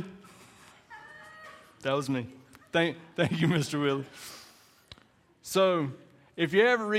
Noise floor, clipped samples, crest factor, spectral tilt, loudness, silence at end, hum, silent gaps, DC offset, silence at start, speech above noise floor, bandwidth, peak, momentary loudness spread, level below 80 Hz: -62 dBFS; under 0.1%; 22 dB; -5.5 dB/octave; -28 LUFS; 0 s; none; none; under 0.1%; 0 s; 35 dB; 16 kHz; -10 dBFS; 23 LU; -70 dBFS